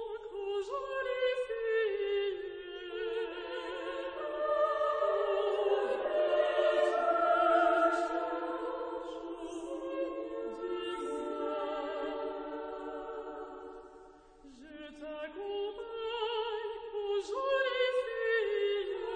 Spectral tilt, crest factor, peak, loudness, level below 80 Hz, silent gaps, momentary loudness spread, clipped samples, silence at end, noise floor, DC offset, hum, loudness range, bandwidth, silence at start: -3.5 dB/octave; 18 dB; -16 dBFS; -34 LUFS; -66 dBFS; none; 13 LU; under 0.1%; 0 s; -56 dBFS; under 0.1%; none; 12 LU; 9.6 kHz; 0 s